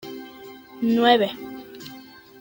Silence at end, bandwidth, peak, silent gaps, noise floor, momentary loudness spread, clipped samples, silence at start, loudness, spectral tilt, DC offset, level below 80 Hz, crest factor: 0.4 s; 17 kHz; -4 dBFS; none; -44 dBFS; 25 LU; under 0.1%; 0.05 s; -20 LUFS; -5 dB/octave; under 0.1%; -66 dBFS; 20 dB